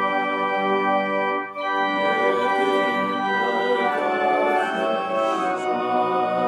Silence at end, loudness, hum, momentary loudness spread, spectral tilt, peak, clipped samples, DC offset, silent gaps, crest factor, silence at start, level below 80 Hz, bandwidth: 0 s; -22 LUFS; none; 3 LU; -5 dB/octave; -8 dBFS; under 0.1%; under 0.1%; none; 14 dB; 0 s; -84 dBFS; 12.5 kHz